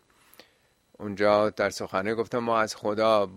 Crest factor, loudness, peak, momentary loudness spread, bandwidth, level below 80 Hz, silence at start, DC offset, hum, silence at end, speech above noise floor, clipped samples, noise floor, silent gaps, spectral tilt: 20 dB; -26 LUFS; -8 dBFS; 7 LU; 15 kHz; -64 dBFS; 1 s; under 0.1%; none; 0 s; 40 dB; under 0.1%; -65 dBFS; none; -4.5 dB/octave